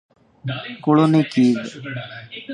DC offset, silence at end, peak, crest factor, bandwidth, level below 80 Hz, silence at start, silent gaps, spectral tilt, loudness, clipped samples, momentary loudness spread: under 0.1%; 0 s; -4 dBFS; 18 dB; 10 kHz; -64 dBFS; 0.45 s; none; -7 dB/octave; -19 LUFS; under 0.1%; 18 LU